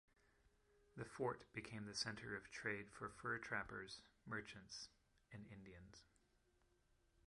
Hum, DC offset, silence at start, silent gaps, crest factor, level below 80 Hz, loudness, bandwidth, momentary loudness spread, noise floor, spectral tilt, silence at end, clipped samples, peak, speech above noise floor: none; under 0.1%; 0.45 s; none; 22 dB; -76 dBFS; -50 LUFS; 11.5 kHz; 15 LU; -80 dBFS; -3.5 dB/octave; 1.25 s; under 0.1%; -30 dBFS; 29 dB